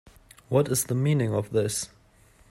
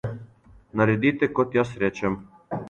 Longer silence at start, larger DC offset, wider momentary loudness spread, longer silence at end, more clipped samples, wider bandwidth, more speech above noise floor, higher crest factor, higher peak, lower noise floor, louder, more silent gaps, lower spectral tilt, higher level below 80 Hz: first, 0.5 s vs 0.05 s; neither; second, 6 LU vs 14 LU; first, 0.65 s vs 0 s; neither; first, 16 kHz vs 9 kHz; first, 33 dB vs 28 dB; about the same, 18 dB vs 20 dB; second, -10 dBFS vs -6 dBFS; first, -58 dBFS vs -51 dBFS; about the same, -26 LUFS vs -24 LUFS; neither; second, -5.5 dB/octave vs -7.5 dB/octave; about the same, -58 dBFS vs -54 dBFS